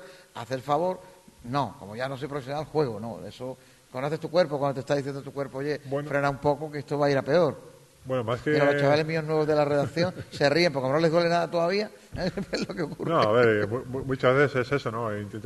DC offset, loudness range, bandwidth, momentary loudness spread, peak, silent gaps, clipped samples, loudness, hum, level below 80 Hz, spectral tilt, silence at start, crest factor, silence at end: under 0.1%; 7 LU; 12.5 kHz; 13 LU; -8 dBFS; none; under 0.1%; -26 LUFS; none; -58 dBFS; -6.5 dB/octave; 0 s; 18 dB; 0 s